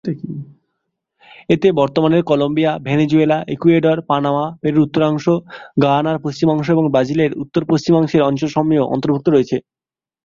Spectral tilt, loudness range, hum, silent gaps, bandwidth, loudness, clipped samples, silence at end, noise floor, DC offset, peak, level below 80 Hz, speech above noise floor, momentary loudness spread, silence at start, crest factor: -7.5 dB/octave; 1 LU; none; none; 7.4 kHz; -16 LUFS; under 0.1%; 0.65 s; under -90 dBFS; under 0.1%; 0 dBFS; -52 dBFS; over 75 dB; 6 LU; 0.05 s; 16 dB